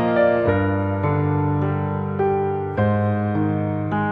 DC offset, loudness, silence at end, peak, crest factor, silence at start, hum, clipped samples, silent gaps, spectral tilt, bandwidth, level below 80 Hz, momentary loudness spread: under 0.1%; -21 LUFS; 0 s; -6 dBFS; 14 dB; 0 s; none; under 0.1%; none; -11 dB/octave; 4.7 kHz; -48 dBFS; 6 LU